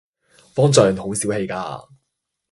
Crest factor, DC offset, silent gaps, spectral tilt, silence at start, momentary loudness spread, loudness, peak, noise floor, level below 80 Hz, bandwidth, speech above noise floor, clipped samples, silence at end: 20 dB; under 0.1%; none; -5 dB/octave; 0.55 s; 16 LU; -19 LUFS; 0 dBFS; -77 dBFS; -52 dBFS; 11.5 kHz; 59 dB; under 0.1%; 0.7 s